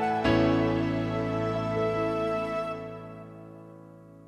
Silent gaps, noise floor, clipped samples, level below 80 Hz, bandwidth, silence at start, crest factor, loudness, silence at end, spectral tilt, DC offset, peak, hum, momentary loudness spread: none; -49 dBFS; under 0.1%; -50 dBFS; 10.5 kHz; 0 s; 16 dB; -28 LUFS; 0.05 s; -7.5 dB/octave; under 0.1%; -12 dBFS; none; 22 LU